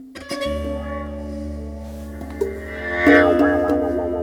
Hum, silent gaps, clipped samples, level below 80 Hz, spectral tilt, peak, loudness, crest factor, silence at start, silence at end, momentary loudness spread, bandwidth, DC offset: none; none; under 0.1%; -36 dBFS; -6.5 dB/octave; 0 dBFS; -20 LUFS; 20 dB; 0 s; 0 s; 19 LU; 15.5 kHz; under 0.1%